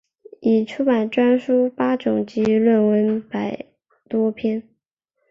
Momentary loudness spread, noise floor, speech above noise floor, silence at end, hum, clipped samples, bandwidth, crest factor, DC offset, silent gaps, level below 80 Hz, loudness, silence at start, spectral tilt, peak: 10 LU; -75 dBFS; 56 dB; 0.7 s; none; under 0.1%; 7 kHz; 14 dB; under 0.1%; none; -62 dBFS; -20 LUFS; 0.4 s; -8 dB/octave; -6 dBFS